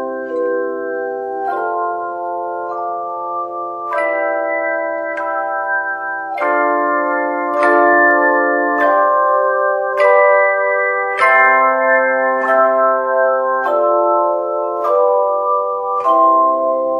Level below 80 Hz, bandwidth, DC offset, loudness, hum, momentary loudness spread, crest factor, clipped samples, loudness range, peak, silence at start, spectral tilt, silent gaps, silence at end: -70 dBFS; 10.5 kHz; under 0.1%; -15 LUFS; none; 11 LU; 14 dB; under 0.1%; 8 LU; 0 dBFS; 0 s; -5 dB/octave; none; 0 s